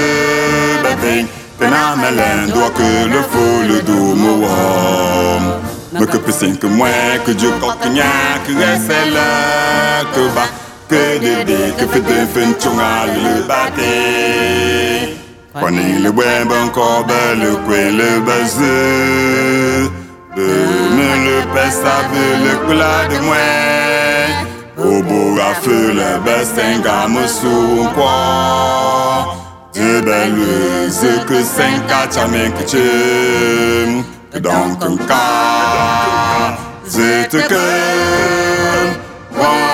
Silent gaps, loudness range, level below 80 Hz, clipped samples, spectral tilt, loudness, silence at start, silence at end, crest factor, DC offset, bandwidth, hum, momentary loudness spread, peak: none; 1 LU; -44 dBFS; under 0.1%; -4 dB/octave; -13 LUFS; 0 s; 0 s; 12 dB; under 0.1%; 17 kHz; none; 5 LU; 0 dBFS